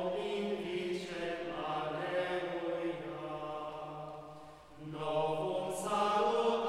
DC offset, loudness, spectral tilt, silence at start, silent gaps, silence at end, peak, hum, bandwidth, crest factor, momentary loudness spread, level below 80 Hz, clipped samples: under 0.1%; -36 LUFS; -5 dB/octave; 0 s; none; 0 s; -20 dBFS; none; 15 kHz; 16 dB; 16 LU; -68 dBFS; under 0.1%